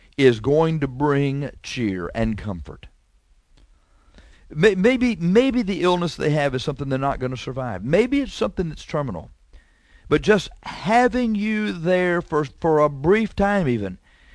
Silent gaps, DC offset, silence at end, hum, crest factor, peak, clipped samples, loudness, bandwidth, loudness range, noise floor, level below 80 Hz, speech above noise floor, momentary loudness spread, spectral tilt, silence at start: none; under 0.1%; 0.4 s; none; 20 dB; -2 dBFS; under 0.1%; -21 LUFS; 11 kHz; 5 LU; -58 dBFS; -42 dBFS; 38 dB; 11 LU; -6.5 dB/octave; 0.2 s